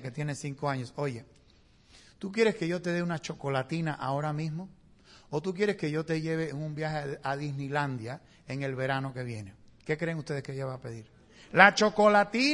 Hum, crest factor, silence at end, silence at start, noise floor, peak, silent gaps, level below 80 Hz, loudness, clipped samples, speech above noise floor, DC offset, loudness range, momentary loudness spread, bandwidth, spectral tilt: none; 28 dB; 0 s; 0 s; -61 dBFS; -2 dBFS; none; -64 dBFS; -29 LUFS; under 0.1%; 31 dB; under 0.1%; 7 LU; 19 LU; 11.5 kHz; -5.5 dB/octave